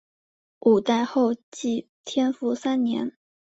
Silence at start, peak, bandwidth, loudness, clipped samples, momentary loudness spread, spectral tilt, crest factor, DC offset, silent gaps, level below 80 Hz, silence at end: 0.65 s; -8 dBFS; 8 kHz; -25 LUFS; under 0.1%; 9 LU; -5 dB/octave; 18 dB; under 0.1%; 1.43-1.52 s, 1.89-2.04 s; -70 dBFS; 0.4 s